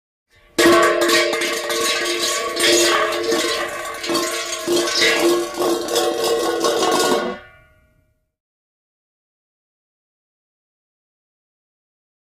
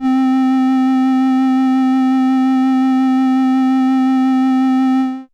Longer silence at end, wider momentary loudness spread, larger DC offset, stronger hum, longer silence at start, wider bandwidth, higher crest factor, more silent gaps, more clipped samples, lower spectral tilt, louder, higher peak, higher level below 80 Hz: first, 4.75 s vs 0.1 s; first, 8 LU vs 0 LU; neither; neither; first, 0.6 s vs 0 s; first, 15.5 kHz vs 6.8 kHz; first, 16 dB vs 2 dB; neither; neither; second, -1.5 dB/octave vs -5 dB/octave; second, -17 LUFS vs -14 LUFS; first, -4 dBFS vs -10 dBFS; first, -56 dBFS vs -68 dBFS